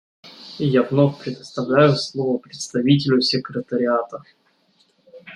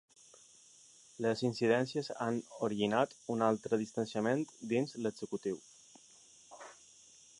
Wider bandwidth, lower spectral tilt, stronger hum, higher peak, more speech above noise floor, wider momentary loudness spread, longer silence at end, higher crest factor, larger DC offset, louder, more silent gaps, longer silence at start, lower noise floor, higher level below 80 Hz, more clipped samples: about the same, 10.5 kHz vs 11 kHz; about the same, -6 dB/octave vs -5.5 dB/octave; neither; first, -2 dBFS vs -16 dBFS; first, 42 dB vs 27 dB; second, 15 LU vs 19 LU; second, 0 s vs 0.65 s; about the same, 20 dB vs 22 dB; neither; first, -20 LUFS vs -35 LUFS; neither; second, 0.25 s vs 1.2 s; about the same, -61 dBFS vs -61 dBFS; first, -62 dBFS vs -78 dBFS; neither